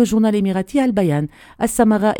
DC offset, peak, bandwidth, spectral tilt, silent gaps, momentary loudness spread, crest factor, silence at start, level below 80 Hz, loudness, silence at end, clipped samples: under 0.1%; 0 dBFS; 18 kHz; -6 dB/octave; none; 8 LU; 16 dB; 0 s; -46 dBFS; -18 LUFS; 0 s; under 0.1%